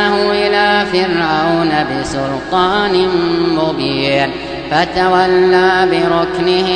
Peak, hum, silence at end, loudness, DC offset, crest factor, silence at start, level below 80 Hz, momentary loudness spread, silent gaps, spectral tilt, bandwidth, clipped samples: 0 dBFS; none; 0 s; -13 LUFS; 0.3%; 12 dB; 0 s; -40 dBFS; 6 LU; none; -5.5 dB/octave; 9.8 kHz; under 0.1%